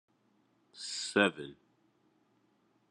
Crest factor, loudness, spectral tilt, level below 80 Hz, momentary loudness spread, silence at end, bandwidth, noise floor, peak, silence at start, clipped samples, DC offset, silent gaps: 26 dB; -32 LUFS; -3.5 dB/octave; -84 dBFS; 19 LU; 1.4 s; 11.5 kHz; -73 dBFS; -12 dBFS; 0.75 s; under 0.1%; under 0.1%; none